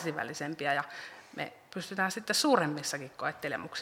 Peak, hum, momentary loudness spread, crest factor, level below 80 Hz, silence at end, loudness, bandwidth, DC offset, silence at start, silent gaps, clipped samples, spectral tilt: -10 dBFS; none; 14 LU; 22 dB; -78 dBFS; 0 s; -32 LUFS; 17 kHz; under 0.1%; 0 s; none; under 0.1%; -3 dB/octave